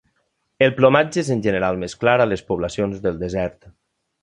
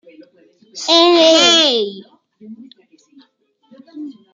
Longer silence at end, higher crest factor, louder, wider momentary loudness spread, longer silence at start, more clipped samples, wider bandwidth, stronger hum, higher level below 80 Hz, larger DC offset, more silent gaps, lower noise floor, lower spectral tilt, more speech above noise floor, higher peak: first, 0.55 s vs 0.2 s; about the same, 18 dB vs 16 dB; second, -20 LUFS vs -11 LUFS; second, 9 LU vs 24 LU; second, 0.6 s vs 0.75 s; neither; first, 11 kHz vs 9.4 kHz; neither; first, -46 dBFS vs -72 dBFS; neither; neither; first, -70 dBFS vs -58 dBFS; first, -6 dB/octave vs -1 dB/octave; first, 51 dB vs 46 dB; about the same, -2 dBFS vs 0 dBFS